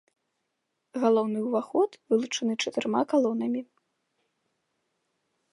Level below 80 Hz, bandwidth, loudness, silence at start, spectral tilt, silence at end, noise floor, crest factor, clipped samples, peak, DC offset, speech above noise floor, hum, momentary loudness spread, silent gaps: -84 dBFS; 11 kHz; -27 LUFS; 0.95 s; -4.5 dB/octave; 1.9 s; -80 dBFS; 20 dB; under 0.1%; -10 dBFS; under 0.1%; 54 dB; none; 6 LU; none